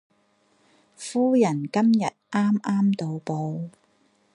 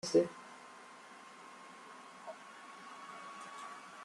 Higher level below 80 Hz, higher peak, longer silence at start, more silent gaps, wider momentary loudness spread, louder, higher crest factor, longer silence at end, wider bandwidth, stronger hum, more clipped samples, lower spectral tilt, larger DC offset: first, -72 dBFS vs -84 dBFS; first, -8 dBFS vs -18 dBFS; first, 1 s vs 0.05 s; neither; second, 11 LU vs 14 LU; first, -24 LUFS vs -44 LUFS; second, 16 dB vs 24 dB; first, 0.65 s vs 0 s; about the same, 11 kHz vs 12 kHz; neither; neither; first, -7 dB/octave vs -4.5 dB/octave; neither